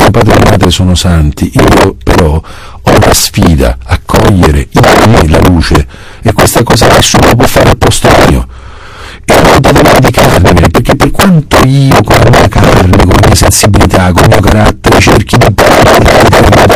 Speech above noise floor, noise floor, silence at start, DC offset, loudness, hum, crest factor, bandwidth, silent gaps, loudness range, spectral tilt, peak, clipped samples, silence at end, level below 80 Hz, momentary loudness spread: 21 dB; -25 dBFS; 0 s; 3%; -4 LUFS; none; 4 dB; over 20 kHz; none; 2 LU; -5 dB/octave; 0 dBFS; 10%; 0 s; -14 dBFS; 6 LU